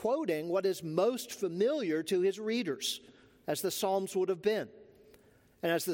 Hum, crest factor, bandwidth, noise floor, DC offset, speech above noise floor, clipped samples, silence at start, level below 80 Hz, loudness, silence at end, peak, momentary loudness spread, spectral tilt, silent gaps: none; 16 dB; 17 kHz; -63 dBFS; under 0.1%; 31 dB; under 0.1%; 0 s; -76 dBFS; -33 LUFS; 0 s; -16 dBFS; 6 LU; -4 dB/octave; none